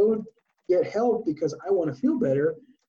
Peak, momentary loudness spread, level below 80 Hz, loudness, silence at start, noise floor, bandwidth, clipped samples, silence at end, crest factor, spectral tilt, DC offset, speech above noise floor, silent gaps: -12 dBFS; 6 LU; -68 dBFS; -25 LUFS; 0 s; -43 dBFS; 7.2 kHz; under 0.1%; 0.3 s; 12 dB; -8 dB/octave; under 0.1%; 19 dB; none